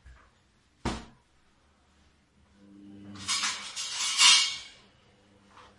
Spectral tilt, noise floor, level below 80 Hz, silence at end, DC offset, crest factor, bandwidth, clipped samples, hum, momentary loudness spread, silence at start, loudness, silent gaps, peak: 0.5 dB/octave; -66 dBFS; -56 dBFS; 0.2 s; under 0.1%; 26 dB; 11.5 kHz; under 0.1%; none; 23 LU; 0.05 s; -24 LUFS; none; -6 dBFS